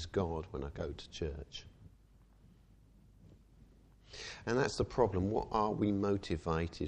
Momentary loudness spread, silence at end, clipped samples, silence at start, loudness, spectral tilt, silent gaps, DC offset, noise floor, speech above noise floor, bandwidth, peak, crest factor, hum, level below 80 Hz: 14 LU; 0 s; under 0.1%; 0 s; -36 LUFS; -6.5 dB/octave; none; under 0.1%; -63 dBFS; 28 dB; 10.5 kHz; -16 dBFS; 22 dB; none; -52 dBFS